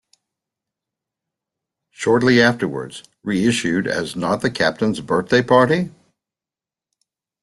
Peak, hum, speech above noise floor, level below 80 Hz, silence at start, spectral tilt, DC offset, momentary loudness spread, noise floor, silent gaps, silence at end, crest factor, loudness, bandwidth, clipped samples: -2 dBFS; none; 72 dB; -56 dBFS; 2 s; -5 dB/octave; under 0.1%; 11 LU; -90 dBFS; none; 1.55 s; 18 dB; -18 LUFS; 12 kHz; under 0.1%